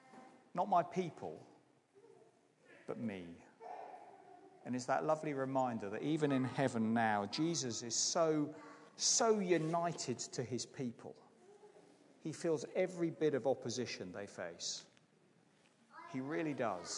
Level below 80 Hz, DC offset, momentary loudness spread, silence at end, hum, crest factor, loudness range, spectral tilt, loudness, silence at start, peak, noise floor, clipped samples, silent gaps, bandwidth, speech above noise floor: -90 dBFS; under 0.1%; 18 LU; 0 s; none; 20 dB; 9 LU; -4 dB/octave; -38 LUFS; 0.1 s; -20 dBFS; -71 dBFS; under 0.1%; none; 11 kHz; 33 dB